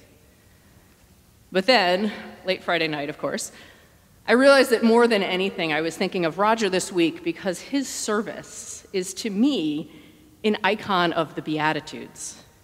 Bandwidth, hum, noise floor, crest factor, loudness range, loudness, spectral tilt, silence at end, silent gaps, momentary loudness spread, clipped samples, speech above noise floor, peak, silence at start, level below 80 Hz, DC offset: 16 kHz; none; -55 dBFS; 20 dB; 6 LU; -22 LUFS; -4 dB/octave; 0.25 s; none; 16 LU; under 0.1%; 32 dB; -4 dBFS; 1.5 s; -62 dBFS; under 0.1%